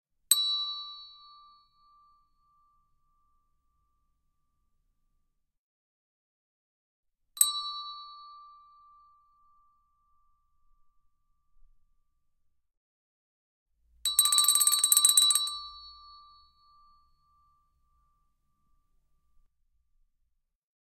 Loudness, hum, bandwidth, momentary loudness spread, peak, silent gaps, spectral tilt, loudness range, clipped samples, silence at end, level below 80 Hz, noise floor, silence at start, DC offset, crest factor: -23 LUFS; none; 15.5 kHz; 25 LU; -4 dBFS; 5.58-7.03 s, 12.77-13.66 s; 6 dB/octave; 14 LU; under 0.1%; 5 s; -72 dBFS; -77 dBFS; 0.3 s; under 0.1%; 30 dB